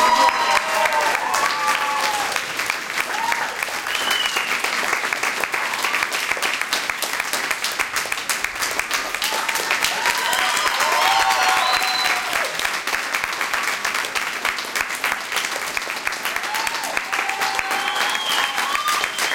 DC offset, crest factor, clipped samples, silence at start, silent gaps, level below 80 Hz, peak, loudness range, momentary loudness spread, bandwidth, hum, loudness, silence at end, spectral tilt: under 0.1%; 20 dB; under 0.1%; 0 s; none; -56 dBFS; 0 dBFS; 4 LU; 6 LU; 17 kHz; none; -20 LUFS; 0 s; 0.5 dB/octave